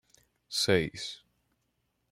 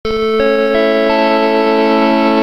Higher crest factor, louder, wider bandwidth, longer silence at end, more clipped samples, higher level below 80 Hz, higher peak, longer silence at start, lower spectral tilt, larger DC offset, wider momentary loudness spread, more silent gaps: first, 24 dB vs 12 dB; second, -30 LUFS vs -12 LUFS; first, 16 kHz vs 12 kHz; first, 0.95 s vs 0 s; neither; second, -62 dBFS vs -40 dBFS; second, -10 dBFS vs 0 dBFS; first, 0.5 s vs 0.05 s; second, -3.5 dB/octave vs -6 dB/octave; second, under 0.1% vs 1%; first, 15 LU vs 1 LU; neither